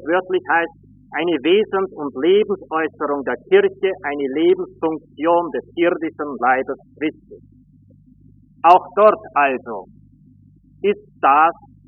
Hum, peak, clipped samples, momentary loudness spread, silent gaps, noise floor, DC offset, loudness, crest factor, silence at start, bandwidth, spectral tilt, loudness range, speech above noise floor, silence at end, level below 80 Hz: 50 Hz at -55 dBFS; 0 dBFS; under 0.1%; 12 LU; none; -50 dBFS; under 0.1%; -18 LUFS; 18 dB; 0 s; 3.8 kHz; 0.5 dB/octave; 3 LU; 32 dB; 0.35 s; -60 dBFS